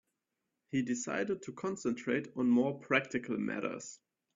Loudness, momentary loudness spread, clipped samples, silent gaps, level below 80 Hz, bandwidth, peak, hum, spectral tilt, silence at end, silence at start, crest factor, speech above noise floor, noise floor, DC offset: -34 LUFS; 9 LU; under 0.1%; none; -76 dBFS; 7.6 kHz; -14 dBFS; none; -5 dB/octave; 0.4 s; 0.75 s; 22 dB; 53 dB; -86 dBFS; under 0.1%